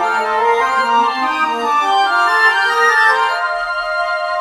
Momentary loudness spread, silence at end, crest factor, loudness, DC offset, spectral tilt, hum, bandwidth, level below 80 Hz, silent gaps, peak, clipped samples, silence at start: 7 LU; 0 s; 14 dB; -14 LUFS; under 0.1%; -0.5 dB/octave; none; 16 kHz; -54 dBFS; none; 0 dBFS; under 0.1%; 0 s